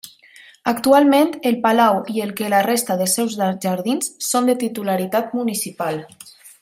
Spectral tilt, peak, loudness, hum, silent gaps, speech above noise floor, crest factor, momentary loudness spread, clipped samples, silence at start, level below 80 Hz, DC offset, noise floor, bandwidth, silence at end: -4 dB/octave; -2 dBFS; -19 LUFS; none; none; 29 dB; 16 dB; 9 LU; under 0.1%; 0.05 s; -66 dBFS; under 0.1%; -47 dBFS; 16 kHz; 0.15 s